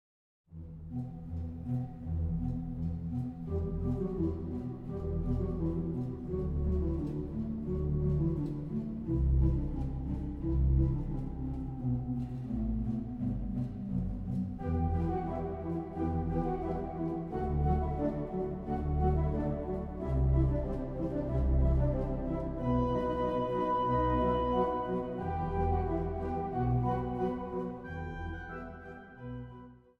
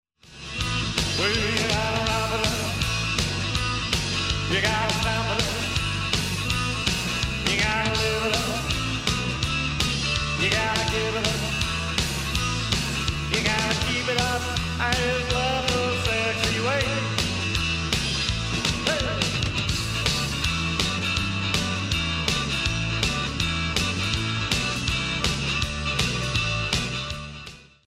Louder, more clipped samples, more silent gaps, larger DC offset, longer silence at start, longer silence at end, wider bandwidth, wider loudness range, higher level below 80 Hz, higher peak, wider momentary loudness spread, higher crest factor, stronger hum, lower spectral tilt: second, -34 LUFS vs -24 LUFS; neither; neither; neither; first, 0.5 s vs 0.25 s; about the same, 0.25 s vs 0.25 s; second, 4.3 kHz vs 16 kHz; first, 5 LU vs 1 LU; about the same, -38 dBFS vs -36 dBFS; second, -18 dBFS vs -6 dBFS; first, 10 LU vs 3 LU; about the same, 16 dB vs 20 dB; neither; first, -10.5 dB/octave vs -3.5 dB/octave